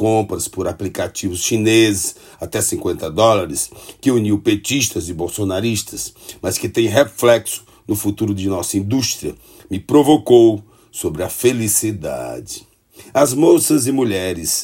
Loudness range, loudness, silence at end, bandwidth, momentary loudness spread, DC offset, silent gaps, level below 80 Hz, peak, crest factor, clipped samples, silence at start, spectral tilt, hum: 3 LU; -17 LUFS; 0 s; 16.5 kHz; 14 LU; under 0.1%; none; -50 dBFS; 0 dBFS; 16 dB; under 0.1%; 0 s; -4.5 dB/octave; none